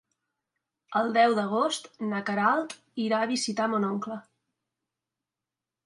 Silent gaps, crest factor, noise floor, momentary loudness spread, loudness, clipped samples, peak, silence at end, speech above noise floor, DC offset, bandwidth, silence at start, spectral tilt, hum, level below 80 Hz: none; 18 dB; -89 dBFS; 11 LU; -27 LUFS; under 0.1%; -10 dBFS; 1.65 s; 63 dB; under 0.1%; 11.5 kHz; 0.9 s; -4 dB/octave; none; -80 dBFS